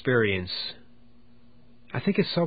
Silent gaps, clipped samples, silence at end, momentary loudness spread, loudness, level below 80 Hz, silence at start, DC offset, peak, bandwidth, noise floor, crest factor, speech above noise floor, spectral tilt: none; under 0.1%; 0 s; 12 LU; -27 LUFS; -54 dBFS; 0.05 s; 0.4%; -10 dBFS; 5 kHz; -58 dBFS; 18 dB; 32 dB; -10.5 dB/octave